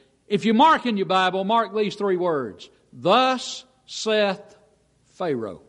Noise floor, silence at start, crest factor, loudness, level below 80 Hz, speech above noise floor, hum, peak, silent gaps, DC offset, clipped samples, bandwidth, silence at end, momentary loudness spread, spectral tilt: -61 dBFS; 0.3 s; 18 dB; -22 LUFS; -66 dBFS; 39 dB; none; -6 dBFS; none; under 0.1%; under 0.1%; 11 kHz; 0.1 s; 15 LU; -4.5 dB/octave